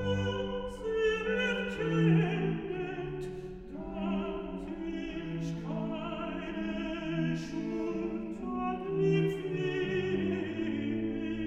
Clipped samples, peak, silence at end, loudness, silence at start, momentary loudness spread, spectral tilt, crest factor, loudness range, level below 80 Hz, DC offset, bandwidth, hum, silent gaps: under 0.1%; -16 dBFS; 0 s; -33 LUFS; 0 s; 9 LU; -7.5 dB/octave; 16 dB; 6 LU; -52 dBFS; under 0.1%; 8.4 kHz; none; none